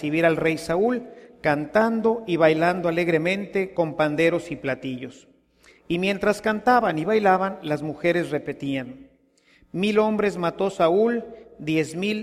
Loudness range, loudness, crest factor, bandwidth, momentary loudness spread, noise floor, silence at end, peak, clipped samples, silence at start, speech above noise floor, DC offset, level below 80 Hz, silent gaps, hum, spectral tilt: 3 LU; -23 LUFS; 18 dB; 15 kHz; 10 LU; -60 dBFS; 0 s; -6 dBFS; under 0.1%; 0 s; 37 dB; under 0.1%; -58 dBFS; none; none; -6 dB/octave